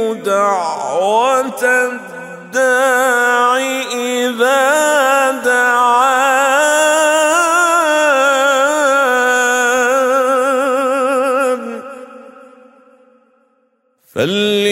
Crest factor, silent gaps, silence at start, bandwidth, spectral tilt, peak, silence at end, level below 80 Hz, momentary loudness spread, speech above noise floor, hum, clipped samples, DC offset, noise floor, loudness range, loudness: 12 dB; none; 0 s; 16.5 kHz; -2 dB/octave; -2 dBFS; 0 s; -68 dBFS; 7 LU; 46 dB; none; under 0.1%; under 0.1%; -60 dBFS; 7 LU; -13 LUFS